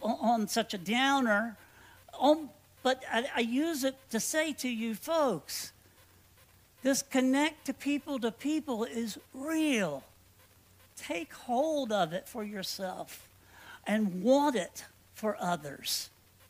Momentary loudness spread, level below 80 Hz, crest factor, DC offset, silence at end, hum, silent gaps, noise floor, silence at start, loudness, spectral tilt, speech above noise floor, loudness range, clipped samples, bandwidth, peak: 14 LU; -72 dBFS; 20 dB; under 0.1%; 0.4 s; none; none; -61 dBFS; 0 s; -32 LUFS; -3.5 dB/octave; 30 dB; 5 LU; under 0.1%; 16 kHz; -12 dBFS